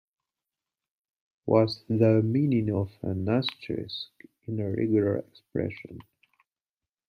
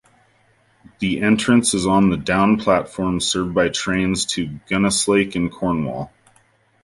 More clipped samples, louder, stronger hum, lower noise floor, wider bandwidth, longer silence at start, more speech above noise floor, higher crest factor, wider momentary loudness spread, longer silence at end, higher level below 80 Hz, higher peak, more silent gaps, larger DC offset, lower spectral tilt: neither; second, -27 LUFS vs -19 LUFS; neither; first, under -90 dBFS vs -58 dBFS; second, 6.2 kHz vs 11.5 kHz; first, 1.45 s vs 1 s; first, over 63 dB vs 40 dB; about the same, 20 dB vs 18 dB; first, 15 LU vs 8 LU; first, 1.05 s vs 0.75 s; second, -66 dBFS vs -44 dBFS; second, -8 dBFS vs -2 dBFS; neither; neither; first, -9 dB/octave vs -4.5 dB/octave